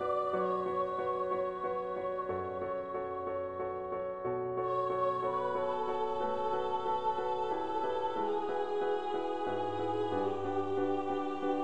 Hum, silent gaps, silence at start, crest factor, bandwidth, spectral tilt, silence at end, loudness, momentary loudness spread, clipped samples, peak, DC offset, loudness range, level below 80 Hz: none; none; 0 s; 12 dB; 9 kHz; -7 dB/octave; 0 s; -35 LUFS; 5 LU; under 0.1%; -20 dBFS; under 0.1%; 3 LU; -68 dBFS